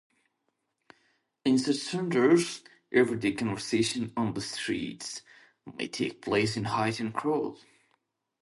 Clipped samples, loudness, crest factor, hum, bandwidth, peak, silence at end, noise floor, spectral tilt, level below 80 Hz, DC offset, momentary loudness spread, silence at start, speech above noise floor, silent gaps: under 0.1%; -29 LUFS; 20 dB; none; 11.5 kHz; -10 dBFS; 0.85 s; -79 dBFS; -5 dB/octave; -66 dBFS; under 0.1%; 13 LU; 1.45 s; 51 dB; none